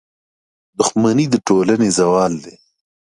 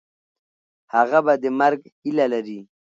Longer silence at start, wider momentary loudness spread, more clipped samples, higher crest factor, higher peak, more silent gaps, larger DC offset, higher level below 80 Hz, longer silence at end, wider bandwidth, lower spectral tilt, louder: second, 0.8 s vs 0.95 s; second, 7 LU vs 12 LU; neither; about the same, 16 dB vs 18 dB; first, 0 dBFS vs -4 dBFS; second, none vs 1.92-2.02 s; neither; first, -54 dBFS vs -78 dBFS; first, 0.55 s vs 0.35 s; first, 11.5 kHz vs 7.8 kHz; second, -5 dB/octave vs -6.5 dB/octave; first, -15 LUFS vs -20 LUFS